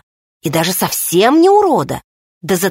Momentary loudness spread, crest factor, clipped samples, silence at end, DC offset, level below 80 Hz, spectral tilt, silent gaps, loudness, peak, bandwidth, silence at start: 16 LU; 14 dB; under 0.1%; 0 s; under 0.1%; -50 dBFS; -4 dB/octave; 2.04-2.41 s; -13 LUFS; 0 dBFS; 16.5 kHz; 0.45 s